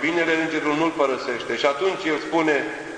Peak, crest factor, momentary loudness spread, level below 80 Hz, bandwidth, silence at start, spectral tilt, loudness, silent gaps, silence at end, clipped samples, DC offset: -6 dBFS; 18 dB; 4 LU; -60 dBFS; 10.5 kHz; 0 s; -4 dB/octave; -22 LUFS; none; 0 s; under 0.1%; under 0.1%